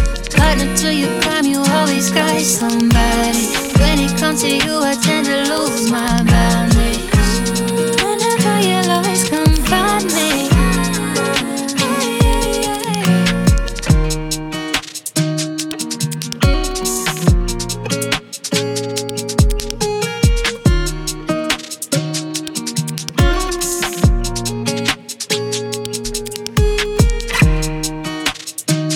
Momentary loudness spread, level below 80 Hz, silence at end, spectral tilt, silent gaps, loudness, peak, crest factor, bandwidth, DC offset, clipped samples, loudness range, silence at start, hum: 7 LU; -22 dBFS; 0 s; -4 dB/octave; none; -16 LUFS; 0 dBFS; 16 dB; 19 kHz; under 0.1%; under 0.1%; 4 LU; 0 s; none